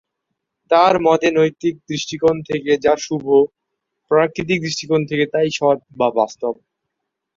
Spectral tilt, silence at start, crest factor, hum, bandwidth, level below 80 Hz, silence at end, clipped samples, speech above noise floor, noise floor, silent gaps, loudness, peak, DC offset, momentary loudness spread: -5 dB/octave; 0.7 s; 16 dB; none; 7.6 kHz; -56 dBFS; 0.85 s; under 0.1%; 61 dB; -78 dBFS; none; -18 LUFS; -2 dBFS; under 0.1%; 9 LU